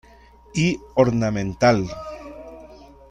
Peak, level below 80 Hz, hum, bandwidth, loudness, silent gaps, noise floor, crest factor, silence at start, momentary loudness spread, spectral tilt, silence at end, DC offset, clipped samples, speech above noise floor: -4 dBFS; -46 dBFS; 60 Hz at -40 dBFS; 10.5 kHz; -21 LUFS; none; -49 dBFS; 20 dB; 0.55 s; 21 LU; -6 dB/octave; 0.35 s; under 0.1%; under 0.1%; 29 dB